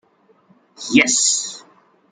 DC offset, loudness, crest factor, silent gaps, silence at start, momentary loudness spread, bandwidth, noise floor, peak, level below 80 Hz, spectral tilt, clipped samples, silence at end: under 0.1%; -15 LUFS; 20 dB; none; 0.8 s; 20 LU; 9.8 kHz; -56 dBFS; -2 dBFS; -64 dBFS; -1 dB/octave; under 0.1%; 0.5 s